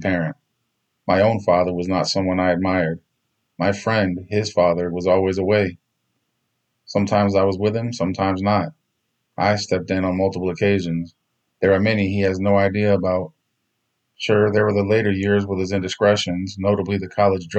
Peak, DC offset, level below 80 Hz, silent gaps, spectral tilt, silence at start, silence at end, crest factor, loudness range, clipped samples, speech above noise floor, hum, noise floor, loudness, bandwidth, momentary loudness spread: -4 dBFS; under 0.1%; -56 dBFS; none; -6 dB/octave; 0 s; 0 s; 16 dB; 2 LU; under 0.1%; 54 dB; none; -73 dBFS; -20 LUFS; 8.6 kHz; 7 LU